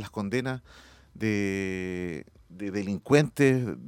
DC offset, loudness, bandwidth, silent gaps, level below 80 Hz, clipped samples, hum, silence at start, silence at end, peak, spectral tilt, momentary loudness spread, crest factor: under 0.1%; -28 LUFS; 17 kHz; none; -58 dBFS; under 0.1%; none; 0 s; 0 s; -6 dBFS; -6.5 dB/octave; 13 LU; 22 dB